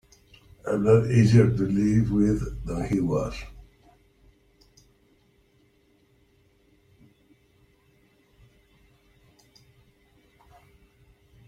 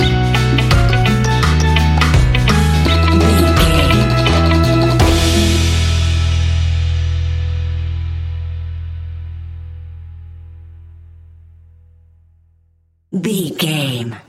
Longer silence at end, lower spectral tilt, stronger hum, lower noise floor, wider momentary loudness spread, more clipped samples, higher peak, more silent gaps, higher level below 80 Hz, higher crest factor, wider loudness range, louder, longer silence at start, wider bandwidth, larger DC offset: first, 7.85 s vs 0.1 s; first, -8.5 dB/octave vs -5.5 dB/octave; neither; first, -63 dBFS vs -57 dBFS; about the same, 16 LU vs 16 LU; neither; second, -6 dBFS vs 0 dBFS; neither; second, -46 dBFS vs -20 dBFS; first, 22 dB vs 14 dB; second, 13 LU vs 18 LU; second, -23 LUFS vs -14 LUFS; first, 0.65 s vs 0 s; second, 9.8 kHz vs 15 kHz; neither